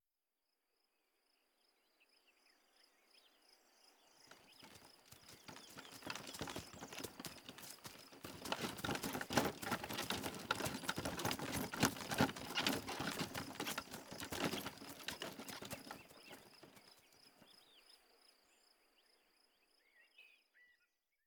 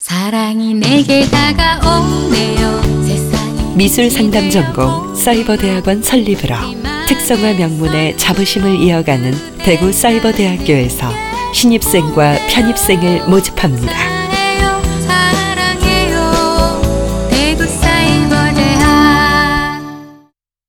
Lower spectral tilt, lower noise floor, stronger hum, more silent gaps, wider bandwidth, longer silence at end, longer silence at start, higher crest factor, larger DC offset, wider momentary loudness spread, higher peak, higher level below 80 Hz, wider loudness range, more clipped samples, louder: second, -3 dB/octave vs -4.5 dB/octave; first, under -90 dBFS vs -51 dBFS; neither; neither; about the same, over 20 kHz vs over 20 kHz; about the same, 0.6 s vs 0.55 s; first, 3.85 s vs 0 s; first, 32 dB vs 12 dB; neither; first, 24 LU vs 5 LU; second, -14 dBFS vs 0 dBFS; second, -70 dBFS vs -24 dBFS; first, 20 LU vs 2 LU; neither; second, -43 LUFS vs -12 LUFS